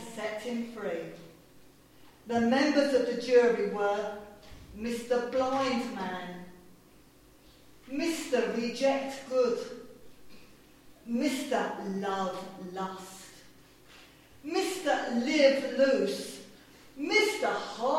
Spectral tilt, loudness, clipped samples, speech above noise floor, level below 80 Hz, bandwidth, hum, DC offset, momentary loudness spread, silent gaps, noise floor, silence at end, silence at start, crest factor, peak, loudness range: -4 dB/octave; -30 LUFS; under 0.1%; 29 dB; -64 dBFS; 16 kHz; none; under 0.1%; 19 LU; none; -58 dBFS; 0 s; 0 s; 20 dB; -10 dBFS; 7 LU